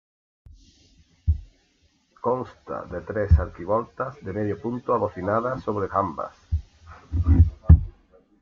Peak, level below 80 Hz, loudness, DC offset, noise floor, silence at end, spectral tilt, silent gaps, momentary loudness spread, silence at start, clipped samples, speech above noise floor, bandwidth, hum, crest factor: -2 dBFS; -30 dBFS; -25 LUFS; under 0.1%; -64 dBFS; 0.5 s; -10.5 dB/octave; none; 14 LU; 1.25 s; under 0.1%; 39 dB; 4 kHz; none; 22 dB